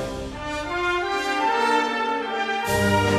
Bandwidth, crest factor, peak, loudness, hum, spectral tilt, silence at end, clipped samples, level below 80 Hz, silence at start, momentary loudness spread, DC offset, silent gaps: 14 kHz; 16 dB; -8 dBFS; -23 LUFS; none; -4.5 dB/octave; 0 s; under 0.1%; -44 dBFS; 0 s; 9 LU; under 0.1%; none